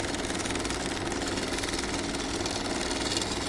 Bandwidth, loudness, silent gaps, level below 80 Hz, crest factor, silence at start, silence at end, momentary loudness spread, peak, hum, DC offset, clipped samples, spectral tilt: 11.5 kHz; -30 LUFS; none; -44 dBFS; 18 dB; 0 s; 0 s; 2 LU; -12 dBFS; none; under 0.1%; under 0.1%; -3 dB/octave